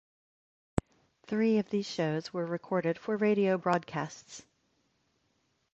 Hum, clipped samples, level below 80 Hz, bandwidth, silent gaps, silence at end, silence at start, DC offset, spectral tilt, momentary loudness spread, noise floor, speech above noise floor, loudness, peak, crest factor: none; under 0.1%; -58 dBFS; 8.6 kHz; none; 1.35 s; 0.75 s; under 0.1%; -6.5 dB/octave; 11 LU; -75 dBFS; 45 dB; -31 LUFS; -8 dBFS; 26 dB